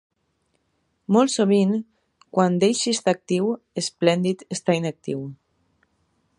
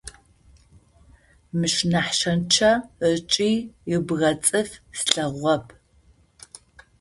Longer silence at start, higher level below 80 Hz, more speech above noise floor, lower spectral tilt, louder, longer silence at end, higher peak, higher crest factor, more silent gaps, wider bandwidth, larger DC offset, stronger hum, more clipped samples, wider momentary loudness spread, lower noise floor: first, 1.1 s vs 0.05 s; second, -70 dBFS vs -54 dBFS; first, 50 dB vs 35 dB; first, -5 dB/octave vs -3.5 dB/octave; about the same, -22 LUFS vs -22 LUFS; second, 1.05 s vs 1.35 s; second, -4 dBFS vs 0 dBFS; about the same, 20 dB vs 24 dB; neither; about the same, 11.5 kHz vs 11.5 kHz; neither; neither; neither; about the same, 11 LU vs 9 LU; first, -71 dBFS vs -58 dBFS